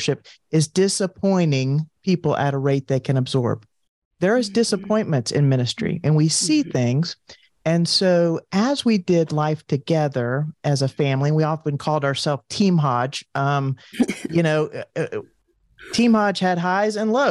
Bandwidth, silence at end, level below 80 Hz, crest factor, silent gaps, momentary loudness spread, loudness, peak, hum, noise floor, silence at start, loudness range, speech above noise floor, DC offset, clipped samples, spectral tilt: 12 kHz; 0 s; -60 dBFS; 12 dB; 3.89-4.11 s; 7 LU; -21 LUFS; -8 dBFS; none; -53 dBFS; 0 s; 2 LU; 33 dB; under 0.1%; under 0.1%; -5.5 dB/octave